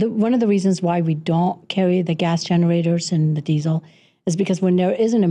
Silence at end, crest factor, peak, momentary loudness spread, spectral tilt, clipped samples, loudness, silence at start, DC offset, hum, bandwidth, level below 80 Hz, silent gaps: 0 s; 10 dB; -10 dBFS; 4 LU; -7 dB/octave; under 0.1%; -19 LUFS; 0 s; under 0.1%; none; 9.8 kHz; -64 dBFS; none